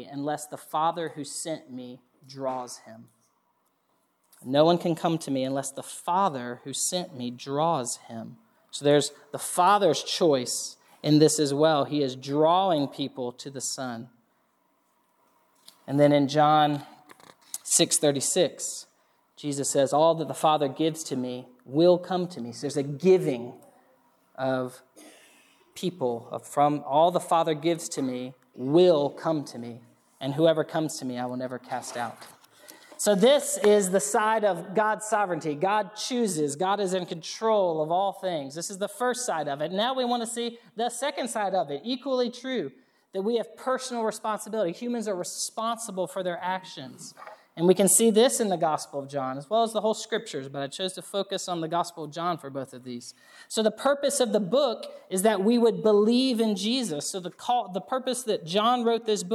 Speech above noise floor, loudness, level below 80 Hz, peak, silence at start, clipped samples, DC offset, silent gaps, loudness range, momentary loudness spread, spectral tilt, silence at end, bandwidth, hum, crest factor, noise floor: 46 dB; -26 LUFS; -86 dBFS; -6 dBFS; 0 s; under 0.1%; under 0.1%; none; 7 LU; 14 LU; -4 dB/octave; 0 s; 15 kHz; none; 20 dB; -71 dBFS